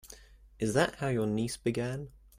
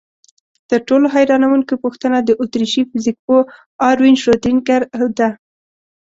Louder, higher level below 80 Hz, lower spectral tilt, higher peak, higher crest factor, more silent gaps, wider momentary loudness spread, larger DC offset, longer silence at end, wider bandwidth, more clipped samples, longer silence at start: second, -32 LUFS vs -15 LUFS; about the same, -56 dBFS vs -52 dBFS; about the same, -5.5 dB/octave vs -5 dB/octave; second, -14 dBFS vs -2 dBFS; about the same, 18 dB vs 14 dB; second, none vs 3.19-3.28 s, 3.66-3.79 s; first, 15 LU vs 7 LU; neither; second, 0.25 s vs 0.7 s; first, 16 kHz vs 7.8 kHz; neither; second, 0.05 s vs 0.7 s